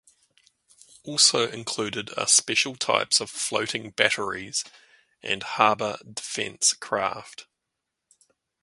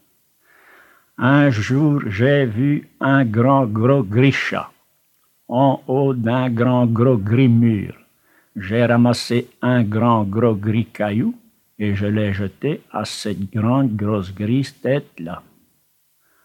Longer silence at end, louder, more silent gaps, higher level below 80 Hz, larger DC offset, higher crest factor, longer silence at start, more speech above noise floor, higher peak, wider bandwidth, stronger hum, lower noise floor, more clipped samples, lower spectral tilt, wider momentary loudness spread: first, 1.2 s vs 1.05 s; second, -23 LUFS vs -18 LUFS; neither; second, -68 dBFS vs -62 dBFS; neither; first, 26 dB vs 18 dB; second, 1.05 s vs 1.2 s; first, 57 dB vs 45 dB; about the same, 0 dBFS vs 0 dBFS; about the same, 11.5 kHz vs 12.5 kHz; neither; first, -83 dBFS vs -62 dBFS; neither; second, -0.5 dB/octave vs -7.5 dB/octave; first, 13 LU vs 10 LU